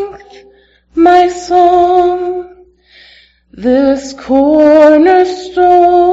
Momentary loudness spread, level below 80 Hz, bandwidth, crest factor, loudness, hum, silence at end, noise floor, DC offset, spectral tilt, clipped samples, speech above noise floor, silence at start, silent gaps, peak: 13 LU; -42 dBFS; 8 kHz; 10 dB; -9 LUFS; none; 0 s; -45 dBFS; under 0.1%; -5 dB/octave; 0.6%; 38 dB; 0 s; none; 0 dBFS